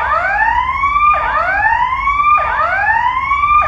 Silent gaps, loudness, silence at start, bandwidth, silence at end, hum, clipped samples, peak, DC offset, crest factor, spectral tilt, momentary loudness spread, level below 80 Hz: none; -13 LUFS; 0 s; 7.6 kHz; 0 s; none; under 0.1%; 0 dBFS; under 0.1%; 12 dB; -4.5 dB/octave; 3 LU; -32 dBFS